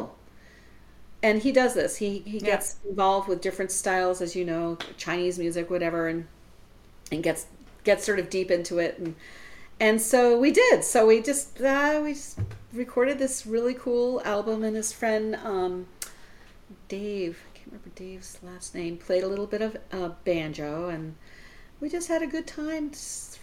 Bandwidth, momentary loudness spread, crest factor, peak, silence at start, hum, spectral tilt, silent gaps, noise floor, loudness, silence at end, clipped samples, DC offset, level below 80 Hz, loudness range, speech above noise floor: 16.5 kHz; 18 LU; 20 dB; -6 dBFS; 0 s; none; -4 dB/octave; none; -51 dBFS; -26 LUFS; 0 s; under 0.1%; under 0.1%; -54 dBFS; 10 LU; 25 dB